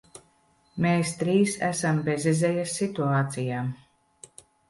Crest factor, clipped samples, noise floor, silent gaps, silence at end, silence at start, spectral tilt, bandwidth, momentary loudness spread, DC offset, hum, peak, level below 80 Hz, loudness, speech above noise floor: 16 dB; under 0.1%; -64 dBFS; none; 0.95 s; 0.15 s; -5.5 dB/octave; 11.5 kHz; 8 LU; under 0.1%; none; -10 dBFS; -64 dBFS; -26 LUFS; 39 dB